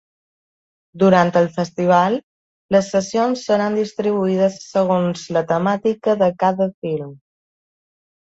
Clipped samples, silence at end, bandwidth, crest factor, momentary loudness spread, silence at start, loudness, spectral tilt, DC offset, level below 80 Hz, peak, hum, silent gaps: under 0.1%; 1.15 s; 8 kHz; 18 dB; 7 LU; 0.95 s; -18 LUFS; -6.5 dB/octave; under 0.1%; -60 dBFS; 0 dBFS; none; 2.23-2.69 s, 6.74-6.82 s